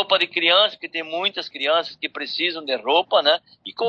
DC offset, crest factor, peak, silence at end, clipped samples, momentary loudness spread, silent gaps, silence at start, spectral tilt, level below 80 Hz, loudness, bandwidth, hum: under 0.1%; 20 dB; -2 dBFS; 0 s; under 0.1%; 12 LU; none; 0 s; -3.5 dB/octave; -76 dBFS; -20 LUFS; 8 kHz; none